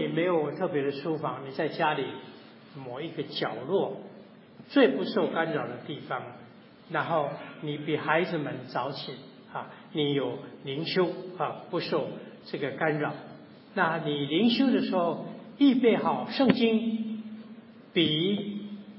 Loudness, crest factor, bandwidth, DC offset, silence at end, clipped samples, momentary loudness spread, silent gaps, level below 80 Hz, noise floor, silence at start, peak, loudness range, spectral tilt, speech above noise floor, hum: -29 LUFS; 24 dB; 5.8 kHz; under 0.1%; 0 s; under 0.1%; 17 LU; none; -76 dBFS; -50 dBFS; 0 s; -6 dBFS; 6 LU; -9.5 dB/octave; 22 dB; none